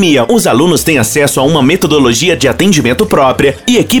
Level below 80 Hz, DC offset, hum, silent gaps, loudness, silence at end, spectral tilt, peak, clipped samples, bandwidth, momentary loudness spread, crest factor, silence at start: -34 dBFS; under 0.1%; none; none; -9 LUFS; 0 s; -4.5 dB/octave; 0 dBFS; under 0.1%; 19.5 kHz; 2 LU; 8 dB; 0 s